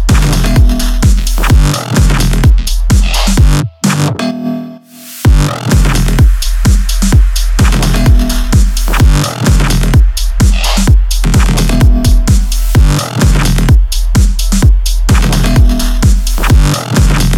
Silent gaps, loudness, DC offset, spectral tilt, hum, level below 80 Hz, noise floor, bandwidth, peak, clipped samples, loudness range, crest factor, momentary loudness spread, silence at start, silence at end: none; -10 LUFS; under 0.1%; -5 dB/octave; none; -10 dBFS; -30 dBFS; 16 kHz; 0 dBFS; 0.4%; 2 LU; 8 dB; 3 LU; 0 s; 0 s